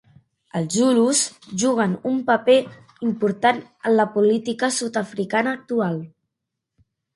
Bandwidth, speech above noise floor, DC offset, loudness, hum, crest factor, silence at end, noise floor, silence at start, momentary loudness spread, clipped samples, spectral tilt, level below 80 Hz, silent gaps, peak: 11.5 kHz; 61 dB; under 0.1%; -21 LUFS; none; 18 dB; 1.1 s; -82 dBFS; 0.55 s; 9 LU; under 0.1%; -4 dB/octave; -68 dBFS; none; -4 dBFS